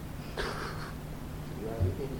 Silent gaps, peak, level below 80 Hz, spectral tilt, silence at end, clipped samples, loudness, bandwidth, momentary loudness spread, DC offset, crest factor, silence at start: none; -18 dBFS; -44 dBFS; -6 dB/octave; 0 s; under 0.1%; -37 LUFS; 19.5 kHz; 8 LU; under 0.1%; 18 dB; 0 s